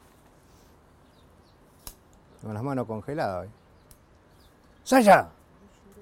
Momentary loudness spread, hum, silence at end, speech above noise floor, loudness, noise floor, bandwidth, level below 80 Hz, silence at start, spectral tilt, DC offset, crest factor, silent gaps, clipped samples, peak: 29 LU; none; 0.7 s; 34 dB; -24 LUFS; -57 dBFS; 16.5 kHz; -60 dBFS; 1.85 s; -5.5 dB/octave; under 0.1%; 22 dB; none; under 0.1%; -6 dBFS